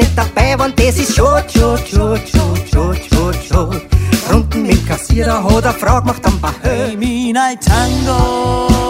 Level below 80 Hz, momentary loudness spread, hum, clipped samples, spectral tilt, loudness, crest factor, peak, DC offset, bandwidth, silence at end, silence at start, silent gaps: -18 dBFS; 4 LU; none; under 0.1%; -5.5 dB/octave; -13 LUFS; 12 dB; 0 dBFS; under 0.1%; 16.5 kHz; 0 s; 0 s; none